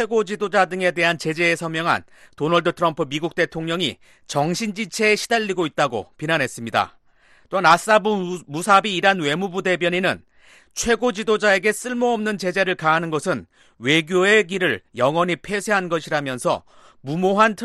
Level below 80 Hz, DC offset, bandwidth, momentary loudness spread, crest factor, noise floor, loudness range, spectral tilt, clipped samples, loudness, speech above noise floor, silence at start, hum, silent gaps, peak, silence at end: -56 dBFS; under 0.1%; 12.5 kHz; 9 LU; 18 dB; -54 dBFS; 3 LU; -4 dB/octave; under 0.1%; -20 LUFS; 34 dB; 0 s; none; none; -2 dBFS; 0 s